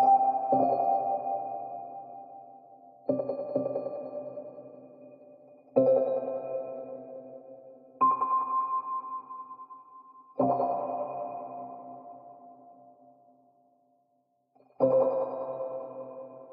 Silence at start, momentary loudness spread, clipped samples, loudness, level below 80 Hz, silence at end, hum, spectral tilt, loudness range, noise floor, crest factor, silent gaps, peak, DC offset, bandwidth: 0 s; 24 LU; under 0.1%; -30 LUFS; -82 dBFS; 0 s; none; -9 dB/octave; 7 LU; -73 dBFS; 20 dB; none; -10 dBFS; under 0.1%; 4.6 kHz